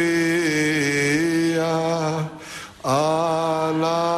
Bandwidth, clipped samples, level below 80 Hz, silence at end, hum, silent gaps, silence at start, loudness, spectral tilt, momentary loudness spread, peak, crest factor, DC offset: 14 kHz; under 0.1%; -58 dBFS; 0 s; none; none; 0 s; -21 LUFS; -5 dB/octave; 9 LU; -10 dBFS; 12 dB; under 0.1%